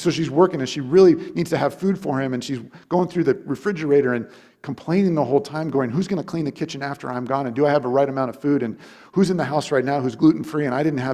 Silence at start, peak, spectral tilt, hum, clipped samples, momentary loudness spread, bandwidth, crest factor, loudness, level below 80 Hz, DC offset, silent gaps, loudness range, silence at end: 0 s; -2 dBFS; -7 dB/octave; none; under 0.1%; 9 LU; 13.5 kHz; 18 dB; -21 LUFS; -60 dBFS; under 0.1%; none; 3 LU; 0 s